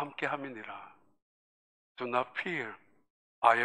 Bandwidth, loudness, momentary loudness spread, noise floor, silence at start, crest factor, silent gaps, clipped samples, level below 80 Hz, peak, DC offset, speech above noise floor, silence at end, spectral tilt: 10 kHz; -34 LUFS; 17 LU; under -90 dBFS; 0 s; 26 dB; 1.22-1.95 s, 3.10-3.42 s; under 0.1%; -86 dBFS; -8 dBFS; under 0.1%; over 54 dB; 0 s; -5 dB/octave